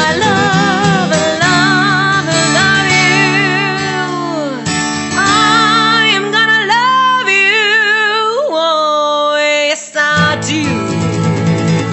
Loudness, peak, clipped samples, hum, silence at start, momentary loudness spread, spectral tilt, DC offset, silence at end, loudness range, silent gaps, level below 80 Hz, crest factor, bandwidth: -11 LUFS; 0 dBFS; under 0.1%; none; 0 s; 7 LU; -3.5 dB/octave; under 0.1%; 0 s; 3 LU; none; -48 dBFS; 12 dB; 8.4 kHz